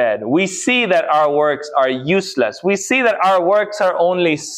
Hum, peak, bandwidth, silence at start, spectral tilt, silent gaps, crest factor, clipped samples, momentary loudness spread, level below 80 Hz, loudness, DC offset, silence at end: none; -4 dBFS; 14.5 kHz; 0 s; -4 dB/octave; none; 12 dB; under 0.1%; 4 LU; -64 dBFS; -16 LUFS; under 0.1%; 0 s